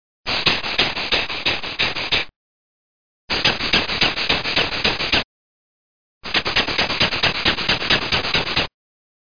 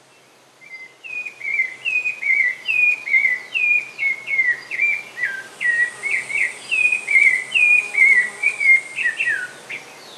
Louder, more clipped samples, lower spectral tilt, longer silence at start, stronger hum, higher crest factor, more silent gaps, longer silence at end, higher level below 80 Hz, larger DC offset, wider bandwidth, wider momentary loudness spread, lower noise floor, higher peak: about the same, -18 LUFS vs -16 LUFS; neither; first, -3 dB/octave vs 0.5 dB/octave; second, 0.2 s vs 0.7 s; neither; first, 22 dB vs 16 dB; first, 2.36-3.28 s, 5.24-6.21 s vs none; first, 0.65 s vs 0 s; first, -40 dBFS vs -84 dBFS; first, 2% vs under 0.1%; second, 5.4 kHz vs 12 kHz; second, 5 LU vs 15 LU; first, under -90 dBFS vs -51 dBFS; first, 0 dBFS vs -4 dBFS